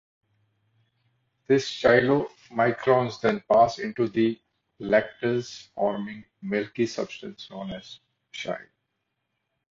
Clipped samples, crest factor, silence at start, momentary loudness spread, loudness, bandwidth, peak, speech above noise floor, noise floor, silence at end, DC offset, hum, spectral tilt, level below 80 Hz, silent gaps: under 0.1%; 22 dB; 1.5 s; 18 LU; -25 LUFS; 7.8 kHz; -6 dBFS; 54 dB; -79 dBFS; 1.1 s; under 0.1%; none; -6 dB/octave; -62 dBFS; none